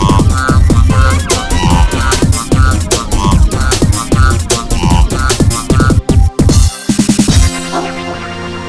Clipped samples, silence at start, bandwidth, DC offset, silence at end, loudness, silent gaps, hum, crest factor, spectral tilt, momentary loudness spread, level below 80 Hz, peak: under 0.1%; 0 s; 11 kHz; 1%; 0 s; -11 LUFS; none; none; 10 dB; -5 dB/octave; 4 LU; -14 dBFS; 0 dBFS